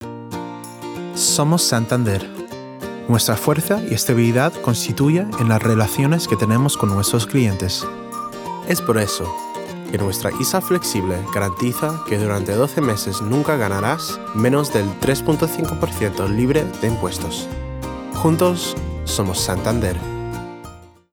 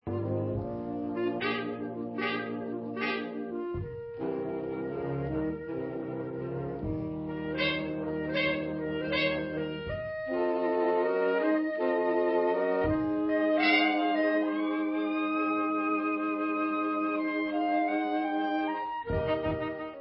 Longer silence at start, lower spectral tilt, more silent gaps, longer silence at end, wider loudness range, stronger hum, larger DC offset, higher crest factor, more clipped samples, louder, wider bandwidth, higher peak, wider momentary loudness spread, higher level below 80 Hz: about the same, 0 s vs 0.05 s; about the same, -5 dB/octave vs -4 dB/octave; neither; first, 0.25 s vs 0 s; second, 4 LU vs 7 LU; neither; neither; about the same, 16 dB vs 18 dB; neither; first, -19 LUFS vs -30 LUFS; first, over 20 kHz vs 5.6 kHz; first, -4 dBFS vs -12 dBFS; first, 13 LU vs 9 LU; first, -42 dBFS vs -52 dBFS